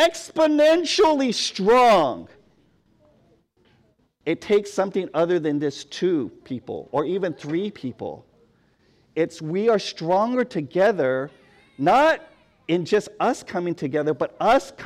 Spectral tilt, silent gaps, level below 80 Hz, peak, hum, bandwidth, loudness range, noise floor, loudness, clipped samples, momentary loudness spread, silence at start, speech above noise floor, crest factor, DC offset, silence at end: -5 dB/octave; none; -60 dBFS; -10 dBFS; none; 15.5 kHz; 7 LU; -63 dBFS; -22 LUFS; under 0.1%; 15 LU; 0 s; 41 dB; 12 dB; under 0.1%; 0 s